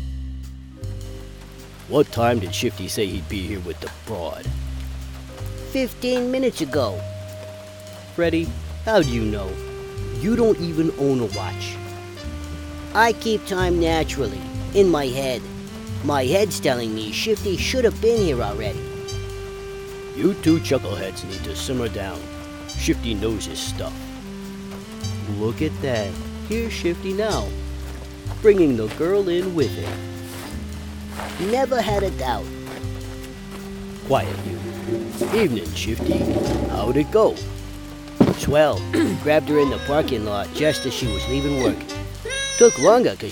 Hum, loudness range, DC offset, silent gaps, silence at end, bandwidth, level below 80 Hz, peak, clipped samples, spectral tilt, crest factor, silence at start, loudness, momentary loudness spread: none; 6 LU; under 0.1%; none; 0 s; 18 kHz; -36 dBFS; 0 dBFS; under 0.1%; -5 dB/octave; 22 dB; 0 s; -22 LUFS; 16 LU